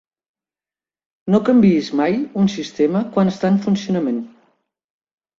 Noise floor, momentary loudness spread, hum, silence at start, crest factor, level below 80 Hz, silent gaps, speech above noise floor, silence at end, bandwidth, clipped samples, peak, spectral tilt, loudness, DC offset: under -90 dBFS; 9 LU; none; 1.25 s; 16 dB; -58 dBFS; none; over 73 dB; 1.1 s; 7.4 kHz; under 0.1%; -4 dBFS; -7.5 dB/octave; -18 LUFS; under 0.1%